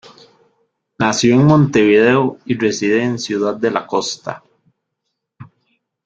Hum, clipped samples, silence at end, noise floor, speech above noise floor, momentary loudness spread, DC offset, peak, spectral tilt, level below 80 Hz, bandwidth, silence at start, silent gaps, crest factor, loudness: none; under 0.1%; 0.65 s; -76 dBFS; 61 dB; 11 LU; under 0.1%; 0 dBFS; -5.5 dB/octave; -54 dBFS; 9 kHz; 1 s; none; 16 dB; -15 LUFS